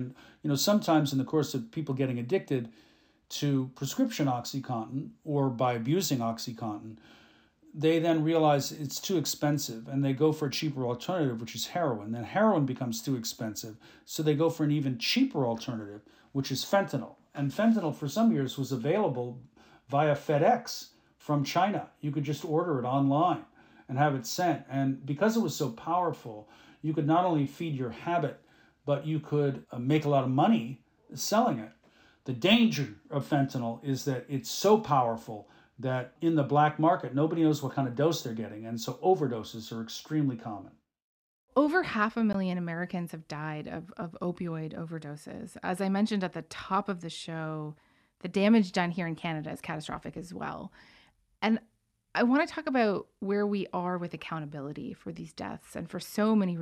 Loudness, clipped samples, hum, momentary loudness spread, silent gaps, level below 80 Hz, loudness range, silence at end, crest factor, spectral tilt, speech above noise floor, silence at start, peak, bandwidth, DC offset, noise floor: -30 LUFS; under 0.1%; none; 14 LU; 41.02-41.48 s; -70 dBFS; 5 LU; 0 s; 20 dB; -5.5 dB/octave; 31 dB; 0 s; -10 dBFS; 17.5 kHz; under 0.1%; -60 dBFS